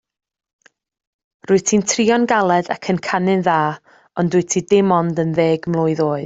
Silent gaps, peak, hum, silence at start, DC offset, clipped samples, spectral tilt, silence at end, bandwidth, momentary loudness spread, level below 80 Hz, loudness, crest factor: none; -2 dBFS; none; 1.5 s; under 0.1%; under 0.1%; -5 dB/octave; 0 s; 8 kHz; 6 LU; -58 dBFS; -17 LUFS; 16 dB